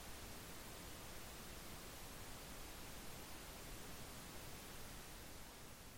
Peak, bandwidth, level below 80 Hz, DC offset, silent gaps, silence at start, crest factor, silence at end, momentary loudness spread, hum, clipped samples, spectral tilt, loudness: -40 dBFS; 16.5 kHz; -60 dBFS; under 0.1%; none; 0 s; 12 dB; 0 s; 1 LU; none; under 0.1%; -3 dB/octave; -54 LUFS